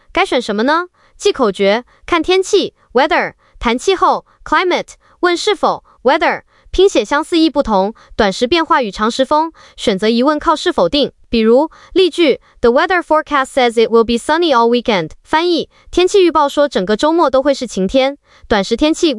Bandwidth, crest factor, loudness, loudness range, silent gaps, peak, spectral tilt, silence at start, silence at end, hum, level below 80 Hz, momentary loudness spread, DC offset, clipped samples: 12 kHz; 12 dB; -14 LUFS; 2 LU; none; -2 dBFS; -4 dB/octave; 0.15 s; 0 s; none; -38 dBFS; 6 LU; under 0.1%; under 0.1%